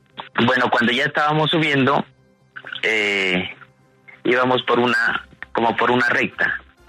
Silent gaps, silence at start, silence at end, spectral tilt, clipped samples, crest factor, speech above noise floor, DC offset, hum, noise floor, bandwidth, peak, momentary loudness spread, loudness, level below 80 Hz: none; 0.15 s; 0.3 s; -5 dB/octave; under 0.1%; 16 dB; 31 dB; under 0.1%; none; -49 dBFS; 13 kHz; -4 dBFS; 11 LU; -18 LUFS; -58 dBFS